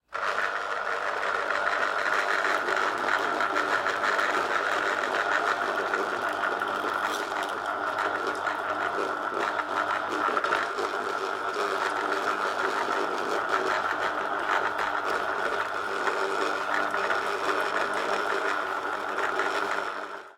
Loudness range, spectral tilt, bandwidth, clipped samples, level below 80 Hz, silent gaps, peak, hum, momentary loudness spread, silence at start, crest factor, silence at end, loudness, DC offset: 3 LU; -2 dB/octave; 16.5 kHz; under 0.1%; -68 dBFS; none; -10 dBFS; none; 4 LU; 0.1 s; 18 dB; 0.05 s; -27 LUFS; under 0.1%